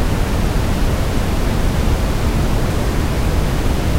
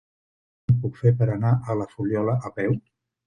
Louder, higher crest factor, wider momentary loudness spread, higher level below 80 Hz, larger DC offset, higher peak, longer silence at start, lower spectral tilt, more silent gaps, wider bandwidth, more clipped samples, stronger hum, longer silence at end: first, -19 LUFS vs -24 LUFS; second, 12 dB vs 18 dB; second, 1 LU vs 7 LU; first, -18 dBFS vs -54 dBFS; neither; first, -2 dBFS vs -6 dBFS; second, 0 s vs 0.7 s; second, -6 dB/octave vs -10.5 dB/octave; neither; first, 16 kHz vs 6.8 kHz; neither; neither; second, 0 s vs 0.5 s